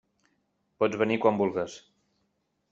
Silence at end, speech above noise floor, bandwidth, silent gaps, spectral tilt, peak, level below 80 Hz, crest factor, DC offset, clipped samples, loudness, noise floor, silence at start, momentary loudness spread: 0.95 s; 49 dB; 7.8 kHz; none; -6 dB/octave; -8 dBFS; -70 dBFS; 22 dB; under 0.1%; under 0.1%; -27 LUFS; -76 dBFS; 0.8 s; 9 LU